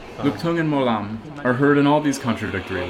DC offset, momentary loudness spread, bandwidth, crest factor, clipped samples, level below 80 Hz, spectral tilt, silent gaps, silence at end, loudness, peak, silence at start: under 0.1%; 9 LU; 13 kHz; 16 dB; under 0.1%; -50 dBFS; -6 dB/octave; none; 0 s; -20 LUFS; -4 dBFS; 0 s